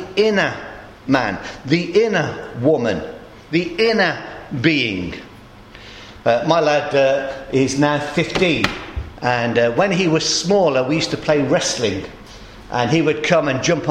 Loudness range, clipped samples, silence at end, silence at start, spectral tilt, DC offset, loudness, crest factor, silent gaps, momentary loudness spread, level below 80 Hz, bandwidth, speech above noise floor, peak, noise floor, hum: 3 LU; under 0.1%; 0 s; 0 s; -4.5 dB/octave; under 0.1%; -18 LUFS; 18 dB; none; 14 LU; -44 dBFS; 12.5 kHz; 23 dB; 0 dBFS; -41 dBFS; none